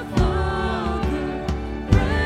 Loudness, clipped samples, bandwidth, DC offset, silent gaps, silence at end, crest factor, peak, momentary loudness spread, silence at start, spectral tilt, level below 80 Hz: -23 LUFS; under 0.1%; 11 kHz; under 0.1%; none; 0 s; 20 dB; 0 dBFS; 7 LU; 0 s; -7 dB/octave; -26 dBFS